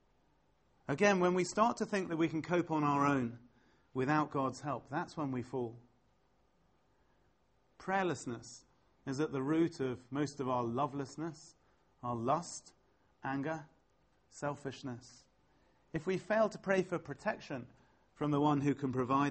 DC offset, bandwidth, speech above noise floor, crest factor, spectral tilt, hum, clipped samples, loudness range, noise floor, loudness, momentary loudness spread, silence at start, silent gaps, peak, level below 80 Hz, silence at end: under 0.1%; 8.4 kHz; 39 dB; 22 dB; -6 dB/octave; none; under 0.1%; 10 LU; -74 dBFS; -36 LUFS; 14 LU; 0.9 s; none; -16 dBFS; -70 dBFS; 0 s